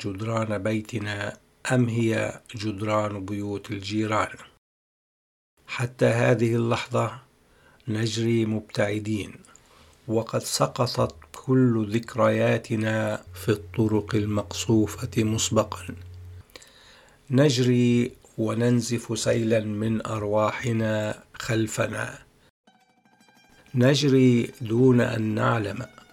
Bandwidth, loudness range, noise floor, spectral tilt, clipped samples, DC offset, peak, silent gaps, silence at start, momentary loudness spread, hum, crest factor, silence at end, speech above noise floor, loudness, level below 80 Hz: 15 kHz; 5 LU; -61 dBFS; -6 dB/octave; under 0.1%; under 0.1%; -6 dBFS; 4.58-5.57 s, 22.50-22.64 s; 0 s; 12 LU; none; 20 dB; 0.25 s; 37 dB; -25 LUFS; -58 dBFS